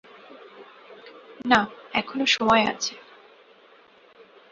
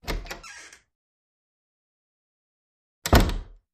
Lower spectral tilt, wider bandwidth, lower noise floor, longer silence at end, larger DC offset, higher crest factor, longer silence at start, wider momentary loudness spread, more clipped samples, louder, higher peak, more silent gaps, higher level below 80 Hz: second, -3 dB/octave vs -5 dB/octave; second, 7.8 kHz vs 15.5 kHz; first, -54 dBFS vs -46 dBFS; first, 1.5 s vs 0.3 s; neither; about the same, 24 dB vs 26 dB; first, 0.3 s vs 0.05 s; first, 27 LU vs 21 LU; neither; about the same, -23 LUFS vs -24 LUFS; about the same, -2 dBFS vs -2 dBFS; second, none vs 0.95-3.02 s; second, -60 dBFS vs -32 dBFS